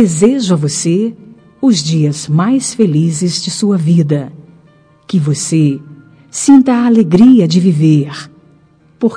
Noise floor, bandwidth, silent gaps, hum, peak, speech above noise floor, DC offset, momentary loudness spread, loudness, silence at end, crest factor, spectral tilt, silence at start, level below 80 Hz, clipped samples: -47 dBFS; 10.5 kHz; none; none; 0 dBFS; 37 dB; under 0.1%; 10 LU; -11 LUFS; 0 s; 12 dB; -6 dB/octave; 0 s; -52 dBFS; 1%